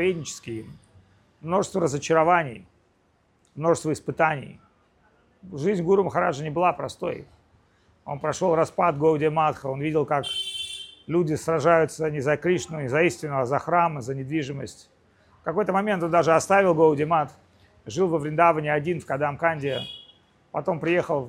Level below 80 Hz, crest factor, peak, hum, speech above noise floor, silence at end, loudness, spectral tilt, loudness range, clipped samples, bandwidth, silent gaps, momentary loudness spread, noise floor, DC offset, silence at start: -60 dBFS; 20 dB; -4 dBFS; none; 41 dB; 0 s; -24 LUFS; -5.5 dB/octave; 4 LU; under 0.1%; 14.5 kHz; none; 14 LU; -65 dBFS; under 0.1%; 0 s